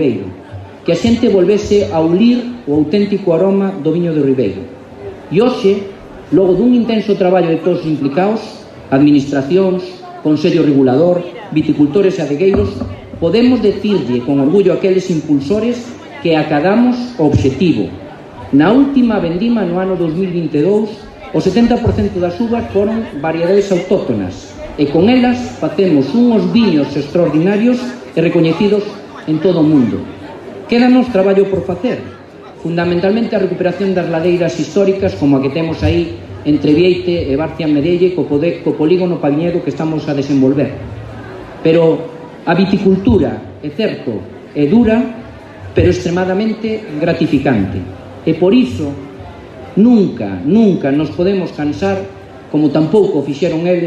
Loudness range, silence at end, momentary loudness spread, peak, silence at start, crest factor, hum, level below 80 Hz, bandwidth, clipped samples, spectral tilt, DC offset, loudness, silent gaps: 2 LU; 0 s; 14 LU; 0 dBFS; 0 s; 12 dB; none; -40 dBFS; 8.4 kHz; under 0.1%; -7.5 dB/octave; under 0.1%; -13 LUFS; none